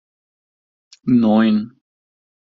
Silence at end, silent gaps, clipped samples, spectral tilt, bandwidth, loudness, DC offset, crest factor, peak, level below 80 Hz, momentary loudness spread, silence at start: 0.85 s; none; under 0.1%; -6.5 dB/octave; 6 kHz; -16 LUFS; under 0.1%; 16 dB; -4 dBFS; -58 dBFS; 15 LU; 1.05 s